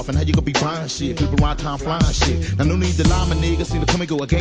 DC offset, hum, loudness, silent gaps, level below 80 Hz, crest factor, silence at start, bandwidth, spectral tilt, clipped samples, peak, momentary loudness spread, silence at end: under 0.1%; none; -19 LUFS; none; -24 dBFS; 16 dB; 0 s; 9.8 kHz; -5.5 dB/octave; under 0.1%; -2 dBFS; 5 LU; 0 s